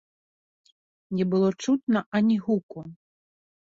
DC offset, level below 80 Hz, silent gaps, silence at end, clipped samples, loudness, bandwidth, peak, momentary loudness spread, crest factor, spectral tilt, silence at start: under 0.1%; -68 dBFS; 1.83-1.87 s, 2.06-2.12 s, 2.63-2.69 s; 0.85 s; under 0.1%; -25 LUFS; 7.8 kHz; -14 dBFS; 18 LU; 14 dB; -7 dB/octave; 1.1 s